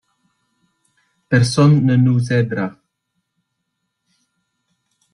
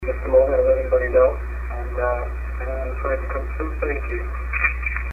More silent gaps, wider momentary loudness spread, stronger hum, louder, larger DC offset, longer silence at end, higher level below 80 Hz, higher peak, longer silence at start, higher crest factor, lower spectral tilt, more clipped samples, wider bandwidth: neither; about the same, 10 LU vs 11 LU; neither; first, -16 LUFS vs -22 LUFS; neither; first, 2.45 s vs 0 s; second, -54 dBFS vs -26 dBFS; about the same, -2 dBFS vs -4 dBFS; first, 1.3 s vs 0 s; about the same, 18 dB vs 16 dB; second, -7 dB/octave vs -9 dB/octave; neither; first, 11 kHz vs 2.9 kHz